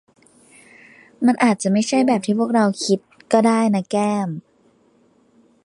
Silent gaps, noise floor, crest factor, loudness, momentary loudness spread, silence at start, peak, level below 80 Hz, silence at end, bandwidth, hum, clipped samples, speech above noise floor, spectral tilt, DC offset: none; -58 dBFS; 18 dB; -19 LUFS; 6 LU; 1.2 s; -2 dBFS; -70 dBFS; 1.25 s; 11.5 kHz; none; under 0.1%; 40 dB; -5.5 dB/octave; under 0.1%